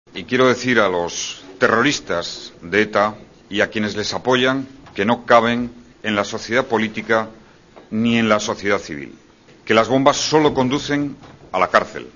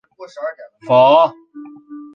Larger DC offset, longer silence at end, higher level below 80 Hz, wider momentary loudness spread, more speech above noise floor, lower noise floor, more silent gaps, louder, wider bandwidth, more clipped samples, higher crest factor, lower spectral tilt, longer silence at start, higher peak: neither; about the same, 0.1 s vs 0.1 s; first, -52 dBFS vs -70 dBFS; second, 13 LU vs 25 LU; first, 27 dB vs 23 dB; first, -46 dBFS vs -37 dBFS; neither; second, -18 LUFS vs -12 LUFS; about the same, 7.4 kHz vs 6.8 kHz; neither; about the same, 20 dB vs 16 dB; second, -4 dB/octave vs -6.5 dB/octave; about the same, 0.15 s vs 0.2 s; about the same, 0 dBFS vs -2 dBFS